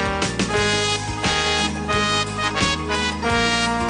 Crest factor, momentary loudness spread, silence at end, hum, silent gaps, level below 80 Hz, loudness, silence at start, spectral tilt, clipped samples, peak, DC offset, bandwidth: 16 dB; 3 LU; 0 s; none; none; -36 dBFS; -20 LUFS; 0 s; -3 dB/octave; under 0.1%; -6 dBFS; under 0.1%; 10 kHz